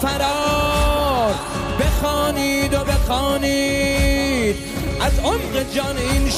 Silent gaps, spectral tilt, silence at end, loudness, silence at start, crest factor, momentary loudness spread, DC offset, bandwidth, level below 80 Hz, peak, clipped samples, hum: none; -4.5 dB/octave; 0 s; -19 LUFS; 0 s; 12 dB; 4 LU; under 0.1%; 16 kHz; -24 dBFS; -6 dBFS; under 0.1%; none